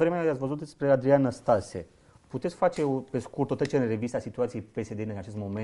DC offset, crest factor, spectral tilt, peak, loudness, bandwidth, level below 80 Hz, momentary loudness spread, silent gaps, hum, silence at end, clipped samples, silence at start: under 0.1%; 18 dB; -7.5 dB/octave; -10 dBFS; -28 LUFS; 11.5 kHz; -60 dBFS; 12 LU; none; none; 0 s; under 0.1%; 0 s